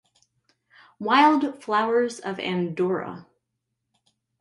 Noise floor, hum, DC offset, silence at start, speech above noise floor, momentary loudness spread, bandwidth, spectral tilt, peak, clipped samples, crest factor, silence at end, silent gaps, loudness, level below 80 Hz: -80 dBFS; none; under 0.1%; 1 s; 57 dB; 15 LU; 11.5 kHz; -5.5 dB/octave; -6 dBFS; under 0.1%; 20 dB; 1.2 s; none; -23 LUFS; -72 dBFS